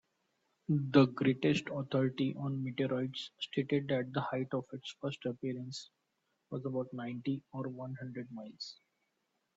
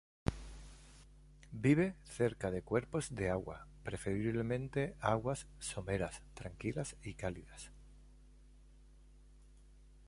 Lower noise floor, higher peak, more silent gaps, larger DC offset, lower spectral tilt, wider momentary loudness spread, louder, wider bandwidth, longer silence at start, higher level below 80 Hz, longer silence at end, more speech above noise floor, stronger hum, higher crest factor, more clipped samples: first, -82 dBFS vs -60 dBFS; first, -12 dBFS vs -18 dBFS; neither; neither; about the same, -7 dB/octave vs -6 dB/octave; second, 15 LU vs 18 LU; first, -36 LUFS vs -39 LUFS; second, 8 kHz vs 11.5 kHz; first, 0.7 s vs 0.25 s; second, -76 dBFS vs -56 dBFS; first, 0.85 s vs 0 s; first, 47 dB vs 23 dB; neither; about the same, 24 dB vs 22 dB; neither